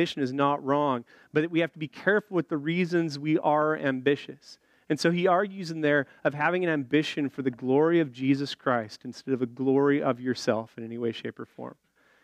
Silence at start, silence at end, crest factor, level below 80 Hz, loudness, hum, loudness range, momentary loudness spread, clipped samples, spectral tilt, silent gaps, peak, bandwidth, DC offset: 0 s; 0.5 s; 18 dB; -78 dBFS; -27 LUFS; none; 2 LU; 9 LU; under 0.1%; -6.5 dB/octave; none; -10 dBFS; 11 kHz; under 0.1%